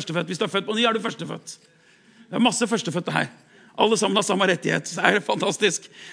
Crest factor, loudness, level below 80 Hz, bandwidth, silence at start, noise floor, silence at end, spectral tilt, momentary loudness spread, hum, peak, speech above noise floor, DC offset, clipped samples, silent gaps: 24 dB; -22 LUFS; -78 dBFS; 10.5 kHz; 0 s; -53 dBFS; 0 s; -3.5 dB/octave; 12 LU; none; 0 dBFS; 30 dB; under 0.1%; under 0.1%; none